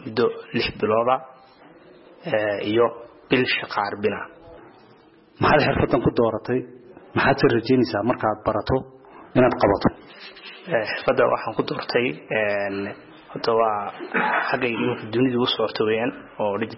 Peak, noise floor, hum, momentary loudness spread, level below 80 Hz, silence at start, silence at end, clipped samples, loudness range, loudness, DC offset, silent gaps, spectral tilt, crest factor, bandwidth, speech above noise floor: -6 dBFS; -52 dBFS; none; 11 LU; -48 dBFS; 0 s; 0 s; under 0.1%; 3 LU; -22 LUFS; under 0.1%; none; -9.5 dB/octave; 16 dB; 5.8 kHz; 30 dB